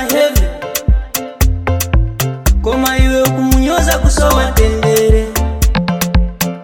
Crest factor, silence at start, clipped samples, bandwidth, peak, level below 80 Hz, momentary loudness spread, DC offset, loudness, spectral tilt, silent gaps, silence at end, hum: 12 dB; 0 s; 0.1%; 17.5 kHz; 0 dBFS; -14 dBFS; 5 LU; under 0.1%; -13 LUFS; -5 dB/octave; none; 0 s; none